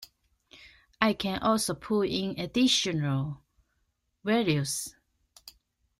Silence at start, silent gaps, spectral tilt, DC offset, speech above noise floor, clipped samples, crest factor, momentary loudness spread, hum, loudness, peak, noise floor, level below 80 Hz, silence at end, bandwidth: 0 s; none; -4.5 dB/octave; under 0.1%; 49 dB; under 0.1%; 22 dB; 12 LU; none; -28 LUFS; -8 dBFS; -76 dBFS; -60 dBFS; 0.5 s; 16 kHz